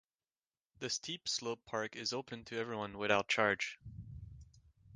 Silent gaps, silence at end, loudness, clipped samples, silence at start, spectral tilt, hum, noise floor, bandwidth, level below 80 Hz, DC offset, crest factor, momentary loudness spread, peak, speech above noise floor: none; 0 s; -37 LUFS; under 0.1%; 0.8 s; -2.5 dB/octave; none; under -90 dBFS; 10 kHz; -64 dBFS; under 0.1%; 26 dB; 19 LU; -14 dBFS; over 52 dB